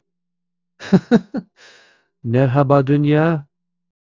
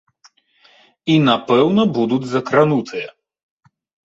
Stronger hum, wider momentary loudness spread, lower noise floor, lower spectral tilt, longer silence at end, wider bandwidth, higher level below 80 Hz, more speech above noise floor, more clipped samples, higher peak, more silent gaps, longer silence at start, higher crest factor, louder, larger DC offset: neither; about the same, 16 LU vs 14 LU; first, -81 dBFS vs -55 dBFS; first, -9 dB/octave vs -7 dB/octave; second, 0.7 s vs 0.95 s; about the same, 7.4 kHz vs 8 kHz; first, -54 dBFS vs -60 dBFS; first, 65 dB vs 39 dB; neither; about the same, 0 dBFS vs -2 dBFS; neither; second, 0.8 s vs 1.05 s; about the same, 18 dB vs 18 dB; about the same, -16 LUFS vs -16 LUFS; neither